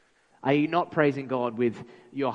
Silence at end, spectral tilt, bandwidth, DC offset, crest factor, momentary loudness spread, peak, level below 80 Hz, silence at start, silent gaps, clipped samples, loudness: 0 s; -8 dB/octave; 7.8 kHz; under 0.1%; 20 dB; 10 LU; -6 dBFS; -70 dBFS; 0.45 s; none; under 0.1%; -27 LUFS